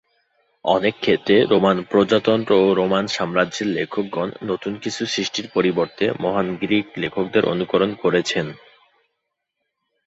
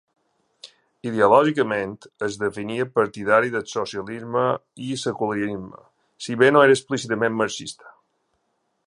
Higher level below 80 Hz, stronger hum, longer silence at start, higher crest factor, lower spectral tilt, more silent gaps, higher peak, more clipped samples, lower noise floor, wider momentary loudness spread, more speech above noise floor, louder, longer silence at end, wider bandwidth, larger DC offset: about the same, -58 dBFS vs -62 dBFS; neither; about the same, 0.65 s vs 0.65 s; about the same, 18 dB vs 20 dB; about the same, -5 dB/octave vs -5 dB/octave; neither; about the same, -2 dBFS vs -2 dBFS; neither; first, -78 dBFS vs -72 dBFS; second, 9 LU vs 16 LU; first, 58 dB vs 50 dB; about the same, -20 LUFS vs -22 LUFS; first, 1.5 s vs 0.95 s; second, 8 kHz vs 11 kHz; neither